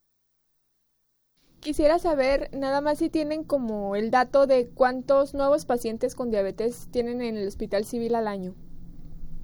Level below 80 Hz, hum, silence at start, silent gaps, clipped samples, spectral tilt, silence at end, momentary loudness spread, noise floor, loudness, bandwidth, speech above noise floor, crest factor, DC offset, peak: -44 dBFS; 60 Hz at -60 dBFS; 1.6 s; none; under 0.1%; -5.5 dB/octave; 0 s; 9 LU; -72 dBFS; -25 LUFS; over 20 kHz; 47 dB; 18 dB; under 0.1%; -8 dBFS